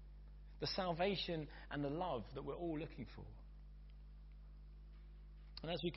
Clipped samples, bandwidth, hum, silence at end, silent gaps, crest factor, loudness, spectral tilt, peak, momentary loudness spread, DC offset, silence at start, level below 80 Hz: under 0.1%; 5.8 kHz; 50 Hz at -55 dBFS; 0 s; none; 18 dB; -44 LUFS; -4 dB/octave; -28 dBFS; 21 LU; under 0.1%; 0 s; -56 dBFS